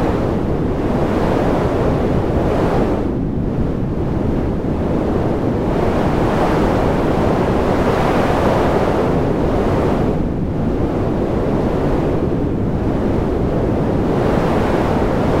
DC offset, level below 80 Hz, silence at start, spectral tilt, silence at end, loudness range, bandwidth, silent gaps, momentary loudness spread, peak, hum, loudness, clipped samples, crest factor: under 0.1%; -26 dBFS; 0 s; -8 dB/octave; 0 s; 3 LU; 16 kHz; none; 4 LU; -2 dBFS; none; -17 LUFS; under 0.1%; 14 dB